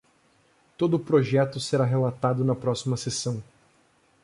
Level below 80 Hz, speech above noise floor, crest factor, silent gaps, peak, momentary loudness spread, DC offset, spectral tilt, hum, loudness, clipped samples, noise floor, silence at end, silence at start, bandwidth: -62 dBFS; 39 dB; 16 dB; none; -10 dBFS; 7 LU; under 0.1%; -6 dB/octave; none; -25 LUFS; under 0.1%; -63 dBFS; 0.8 s; 0.8 s; 11.5 kHz